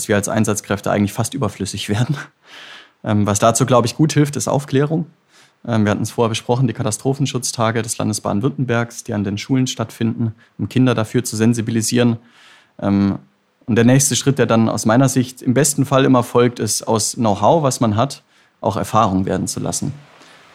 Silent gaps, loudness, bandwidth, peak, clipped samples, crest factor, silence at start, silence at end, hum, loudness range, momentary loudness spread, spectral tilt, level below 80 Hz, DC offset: none; -17 LUFS; 16 kHz; 0 dBFS; under 0.1%; 16 dB; 0 s; 0.55 s; none; 4 LU; 9 LU; -5 dB/octave; -54 dBFS; under 0.1%